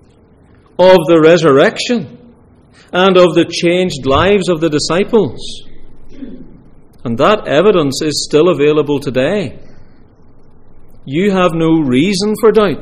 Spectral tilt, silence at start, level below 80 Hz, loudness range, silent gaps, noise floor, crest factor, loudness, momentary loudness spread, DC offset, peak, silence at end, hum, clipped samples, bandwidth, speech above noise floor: -5.5 dB/octave; 0.8 s; -36 dBFS; 5 LU; none; -45 dBFS; 12 dB; -11 LUFS; 19 LU; under 0.1%; 0 dBFS; 0 s; none; under 0.1%; 15 kHz; 34 dB